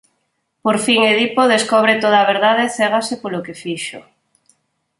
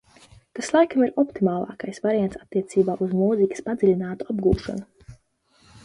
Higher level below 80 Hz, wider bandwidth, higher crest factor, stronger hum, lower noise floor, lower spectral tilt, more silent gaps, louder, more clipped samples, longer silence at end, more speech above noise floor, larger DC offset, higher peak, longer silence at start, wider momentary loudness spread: second, -64 dBFS vs -46 dBFS; about the same, 11.5 kHz vs 11.5 kHz; about the same, 16 dB vs 18 dB; neither; first, -69 dBFS vs -62 dBFS; second, -3 dB/octave vs -7 dB/octave; neither; first, -15 LUFS vs -23 LUFS; neither; first, 1 s vs 0.7 s; first, 54 dB vs 39 dB; neither; first, -2 dBFS vs -6 dBFS; about the same, 0.65 s vs 0.55 s; first, 13 LU vs 10 LU